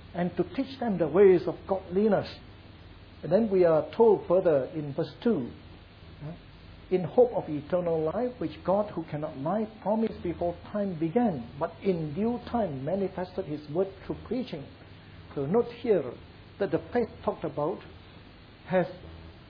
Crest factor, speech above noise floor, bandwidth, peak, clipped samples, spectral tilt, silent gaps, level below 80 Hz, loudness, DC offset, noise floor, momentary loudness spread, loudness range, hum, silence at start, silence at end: 20 dB; 23 dB; 5.4 kHz; -10 dBFS; under 0.1%; -10 dB/octave; none; -56 dBFS; -28 LUFS; under 0.1%; -50 dBFS; 18 LU; 6 LU; none; 0 s; 0.1 s